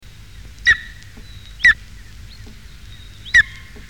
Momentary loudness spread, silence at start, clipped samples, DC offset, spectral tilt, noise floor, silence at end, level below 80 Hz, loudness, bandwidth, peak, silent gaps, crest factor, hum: 15 LU; 0.65 s; under 0.1%; 0.6%; -1 dB/octave; -39 dBFS; 0.45 s; -40 dBFS; -15 LUFS; 17 kHz; -2 dBFS; none; 18 dB; none